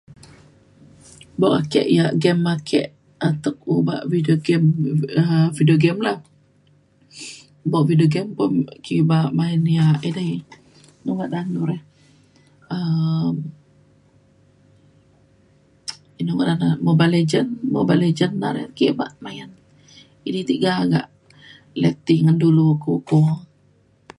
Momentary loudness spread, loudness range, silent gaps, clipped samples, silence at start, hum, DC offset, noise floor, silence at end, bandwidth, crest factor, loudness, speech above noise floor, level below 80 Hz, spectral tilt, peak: 16 LU; 8 LU; none; under 0.1%; 1.4 s; none; under 0.1%; -57 dBFS; 0.75 s; 11 kHz; 18 dB; -19 LUFS; 39 dB; -60 dBFS; -7.5 dB/octave; -2 dBFS